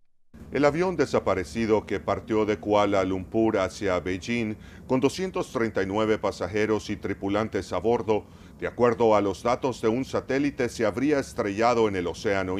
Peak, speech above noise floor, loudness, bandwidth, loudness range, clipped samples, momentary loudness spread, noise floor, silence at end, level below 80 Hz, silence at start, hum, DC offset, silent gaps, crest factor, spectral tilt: -8 dBFS; 23 dB; -26 LUFS; 13.5 kHz; 2 LU; under 0.1%; 6 LU; -48 dBFS; 0 s; -50 dBFS; 0.35 s; none; under 0.1%; none; 18 dB; -6 dB/octave